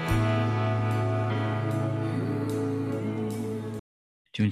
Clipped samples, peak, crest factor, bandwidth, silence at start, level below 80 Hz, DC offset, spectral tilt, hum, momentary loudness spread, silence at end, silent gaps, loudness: under 0.1%; -12 dBFS; 14 dB; 14 kHz; 0 s; -48 dBFS; under 0.1%; -7.5 dB/octave; none; 8 LU; 0 s; 3.79-4.25 s; -29 LUFS